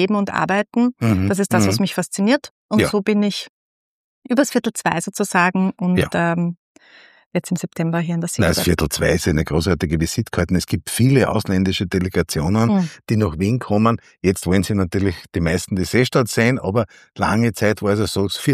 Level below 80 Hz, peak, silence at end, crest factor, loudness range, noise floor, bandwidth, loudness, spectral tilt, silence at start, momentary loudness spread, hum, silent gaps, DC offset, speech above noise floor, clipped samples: -40 dBFS; -2 dBFS; 0 s; 18 dB; 2 LU; -49 dBFS; 15.5 kHz; -19 LUFS; -5.5 dB/octave; 0 s; 6 LU; none; 2.51-2.69 s, 3.49-4.22 s, 6.57-6.75 s, 7.26-7.31 s; under 0.1%; 31 dB; under 0.1%